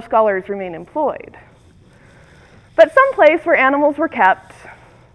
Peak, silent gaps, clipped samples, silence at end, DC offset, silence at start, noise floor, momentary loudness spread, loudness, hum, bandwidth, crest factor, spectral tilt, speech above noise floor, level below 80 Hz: 0 dBFS; none; under 0.1%; 0.4 s; under 0.1%; 0 s; -47 dBFS; 14 LU; -15 LUFS; none; 11 kHz; 16 dB; -5.5 dB/octave; 33 dB; -54 dBFS